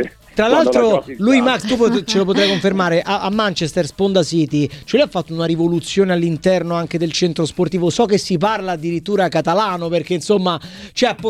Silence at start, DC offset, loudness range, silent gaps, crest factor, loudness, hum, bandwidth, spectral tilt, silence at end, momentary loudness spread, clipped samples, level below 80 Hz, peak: 0 s; under 0.1%; 3 LU; none; 16 dB; -17 LUFS; none; 13.5 kHz; -5.5 dB/octave; 0 s; 6 LU; under 0.1%; -48 dBFS; 0 dBFS